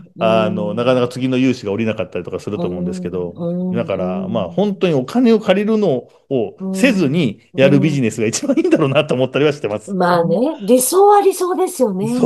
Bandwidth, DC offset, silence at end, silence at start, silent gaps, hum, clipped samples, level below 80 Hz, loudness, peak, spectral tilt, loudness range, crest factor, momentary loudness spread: 13 kHz; under 0.1%; 0 s; 0 s; none; none; under 0.1%; -60 dBFS; -16 LUFS; 0 dBFS; -5.5 dB/octave; 6 LU; 16 dB; 10 LU